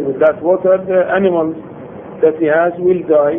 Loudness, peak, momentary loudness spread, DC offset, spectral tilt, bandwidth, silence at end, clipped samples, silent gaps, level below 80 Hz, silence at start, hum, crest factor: -14 LUFS; 0 dBFS; 17 LU; under 0.1%; -10.5 dB/octave; 3.6 kHz; 0 s; under 0.1%; none; -54 dBFS; 0 s; none; 14 dB